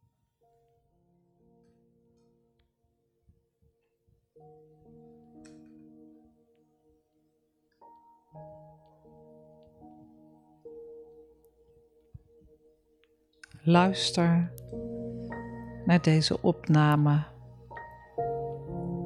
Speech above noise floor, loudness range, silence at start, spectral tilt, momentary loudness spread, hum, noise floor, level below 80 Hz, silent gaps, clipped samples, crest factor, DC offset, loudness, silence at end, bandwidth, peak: 50 dB; 25 LU; 8.35 s; -6.5 dB/octave; 26 LU; none; -75 dBFS; -60 dBFS; none; under 0.1%; 24 dB; under 0.1%; -27 LUFS; 0 s; 11.5 kHz; -8 dBFS